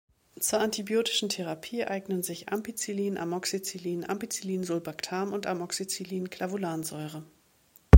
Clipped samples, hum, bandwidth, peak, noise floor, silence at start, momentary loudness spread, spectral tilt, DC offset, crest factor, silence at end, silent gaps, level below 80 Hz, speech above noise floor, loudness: under 0.1%; none; 17 kHz; 0 dBFS; -62 dBFS; 0.4 s; 7 LU; -5 dB/octave; under 0.1%; 28 dB; 0 s; none; -70 dBFS; 30 dB; -32 LUFS